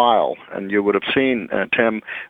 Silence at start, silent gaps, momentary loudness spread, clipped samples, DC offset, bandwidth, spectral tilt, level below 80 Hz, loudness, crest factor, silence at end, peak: 0 s; none; 5 LU; under 0.1%; under 0.1%; 4.6 kHz; -7.5 dB/octave; -58 dBFS; -19 LUFS; 18 dB; 0.05 s; 0 dBFS